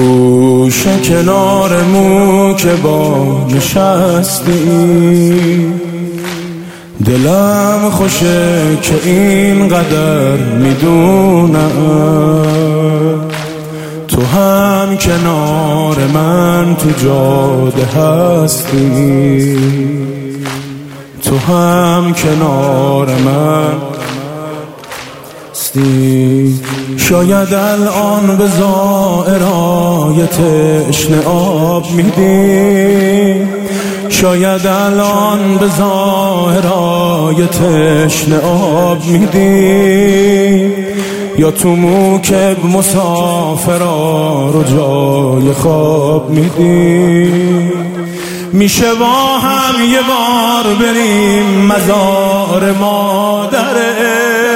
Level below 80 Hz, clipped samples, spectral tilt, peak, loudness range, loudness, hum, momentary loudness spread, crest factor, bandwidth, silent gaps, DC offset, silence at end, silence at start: -38 dBFS; under 0.1%; -5.5 dB/octave; 0 dBFS; 3 LU; -10 LUFS; none; 8 LU; 10 dB; 16.5 kHz; none; under 0.1%; 0 s; 0 s